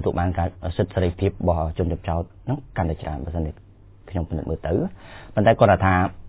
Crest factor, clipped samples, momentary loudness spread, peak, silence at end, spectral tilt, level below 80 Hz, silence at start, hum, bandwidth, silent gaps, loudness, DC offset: 20 dB; under 0.1%; 13 LU; -2 dBFS; 0 s; -11.5 dB/octave; -32 dBFS; 0 s; none; 4 kHz; none; -23 LUFS; under 0.1%